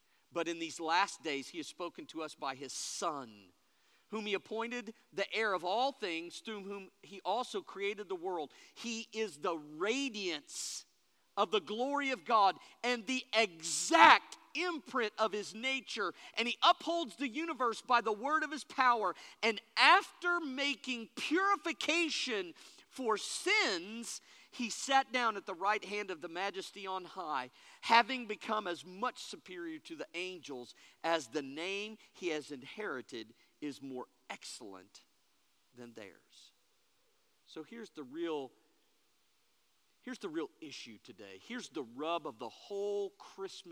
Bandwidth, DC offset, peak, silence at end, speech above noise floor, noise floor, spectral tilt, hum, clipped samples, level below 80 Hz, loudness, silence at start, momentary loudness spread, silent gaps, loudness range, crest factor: over 20 kHz; under 0.1%; -6 dBFS; 0 s; 40 dB; -76 dBFS; -1.5 dB/octave; none; under 0.1%; under -90 dBFS; -35 LUFS; 0.35 s; 18 LU; none; 17 LU; 30 dB